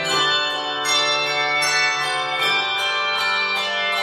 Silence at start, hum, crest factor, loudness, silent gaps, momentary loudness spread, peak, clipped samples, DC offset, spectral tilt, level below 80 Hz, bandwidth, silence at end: 0 s; none; 14 dB; -18 LUFS; none; 3 LU; -6 dBFS; under 0.1%; under 0.1%; -0.5 dB/octave; -66 dBFS; 15.5 kHz; 0 s